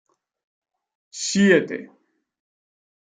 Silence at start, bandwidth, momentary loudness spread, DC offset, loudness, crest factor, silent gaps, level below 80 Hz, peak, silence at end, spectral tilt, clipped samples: 1.15 s; 9.6 kHz; 18 LU; under 0.1%; -19 LUFS; 22 dB; none; -68 dBFS; -4 dBFS; 1.3 s; -4.5 dB/octave; under 0.1%